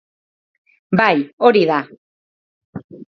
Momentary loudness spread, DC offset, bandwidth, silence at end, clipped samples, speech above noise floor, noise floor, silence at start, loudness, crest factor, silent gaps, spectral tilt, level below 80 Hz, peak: 23 LU; under 0.1%; 6.2 kHz; 0.15 s; under 0.1%; over 75 dB; under -90 dBFS; 0.9 s; -15 LUFS; 20 dB; 1.33-1.38 s, 1.98-2.73 s, 2.84-2.89 s; -7.5 dB/octave; -62 dBFS; 0 dBFS